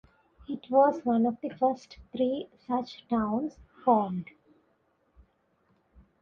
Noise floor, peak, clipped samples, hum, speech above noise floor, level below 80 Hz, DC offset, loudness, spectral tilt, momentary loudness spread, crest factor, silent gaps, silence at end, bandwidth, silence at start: -71 dBFS; -10 dBFS; under 0.1%; none; 43 dB; -62 dBFS; under 0.1%; -29 LUFS; -8 dB/octave; 16 LU; 20 dB; none; 1.95 s; 7 kHz; 0.5 s